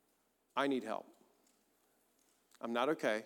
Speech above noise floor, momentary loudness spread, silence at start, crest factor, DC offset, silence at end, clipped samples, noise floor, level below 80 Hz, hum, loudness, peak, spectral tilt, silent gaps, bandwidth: 41 dB; 11 LU; 0.55 s; 22 dB; under 0.1%; 0 s; under 0.1%; -78 dBFS; under -90 dBFS; none; -38 LUFS; -20 dBFS; -4.5 dB/octave; none; 18.5 kHz